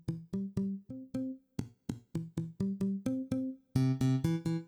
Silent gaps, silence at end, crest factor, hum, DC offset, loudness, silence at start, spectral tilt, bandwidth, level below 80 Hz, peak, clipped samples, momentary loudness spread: none; 0 s; 18 dB; none; under 0.1%; -36 LUFS; 0.05 s; -8 dB/octave; 13.5 kHz; -60 dBFS; -18 dBFS; under 0.1%; 12 LU